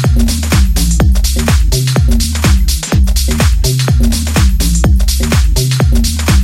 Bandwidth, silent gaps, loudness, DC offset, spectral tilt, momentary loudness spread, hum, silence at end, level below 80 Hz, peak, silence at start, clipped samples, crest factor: 16.5 kHz; none; -12 LUFS; under 0.1%; -4.5 dB/octave; 1 LU; none; 0 s; -12 dBFS; 0 dBFS; 0 s; under 0.1%; 10 dB